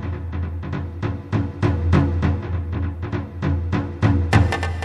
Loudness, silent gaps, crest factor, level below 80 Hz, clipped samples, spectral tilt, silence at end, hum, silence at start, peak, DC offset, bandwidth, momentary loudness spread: -22 LUFS; none; 20 dB; -32 dBFS; under 0.1%; -7.5 dB/octave; 0 s; none; 0 s; -2 dBFS; under 0.1%; 9.4 kHz; 10 LU